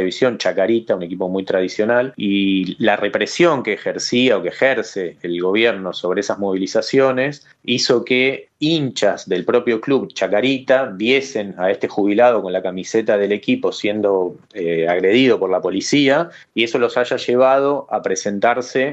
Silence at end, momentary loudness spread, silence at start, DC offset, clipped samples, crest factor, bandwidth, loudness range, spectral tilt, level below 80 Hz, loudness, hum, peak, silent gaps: 0 s; 7 LU; 0 s; under 0.1%; under 0.1%; 16 dB; 8.6 kHz; 1 LU; -4.5 dB/octave; -66 dBFS; -18 LUFS; none; 0 dBFS; none